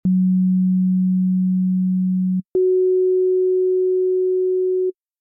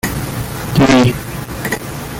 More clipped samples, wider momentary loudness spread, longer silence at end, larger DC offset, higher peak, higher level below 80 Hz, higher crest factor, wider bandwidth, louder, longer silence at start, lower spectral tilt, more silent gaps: neither; second, 3 LU vs 13 LU; first, 0.3 s vs 0 s; neither; second, -12 dBFS vs 0 dBFS; second, -60 dBFS vs -34 dBFS; second, 6 dB vs 16 dB; second, 0.8 kHz vs 17 kHz; second, -18 LUFS vs -15 LUFS; about the same, 0.05 s vs 0.05 s; first, -15.5 dB/octave vs -5.5 dB/octave; neither